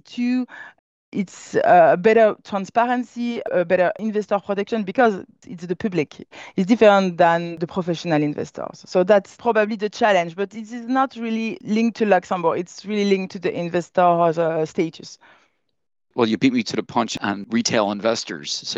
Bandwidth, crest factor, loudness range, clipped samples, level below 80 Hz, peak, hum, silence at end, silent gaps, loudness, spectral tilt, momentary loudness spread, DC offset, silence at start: 8.2 kHz; 18 dB; 4 LU; under 0.1%; -64 dBFS; -2 dBFS; none; 0 s; 0.79-1.12 s; -20 LUFS; -5.5 dB/octave; 13 LU; under 0.1%; 0.1 s